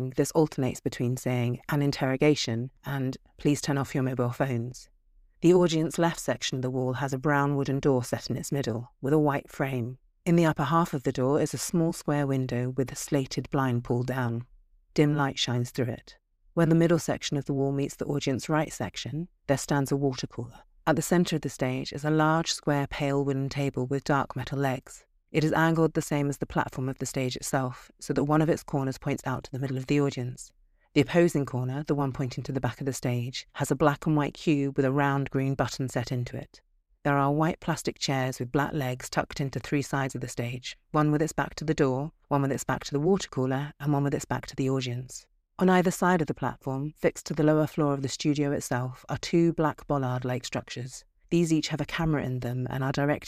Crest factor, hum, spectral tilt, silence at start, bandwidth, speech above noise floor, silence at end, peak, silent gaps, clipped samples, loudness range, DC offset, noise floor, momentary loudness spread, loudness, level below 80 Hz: 20 dB; none; -6 dB/octave; 0 s; 15.5 kHz; 32 dB; 0 s; -8 dBFS; none; under 0.1%; 2 LU; under 0.1%; -59 dBFS; 9 LU; -28 LUFS; -54 dBFS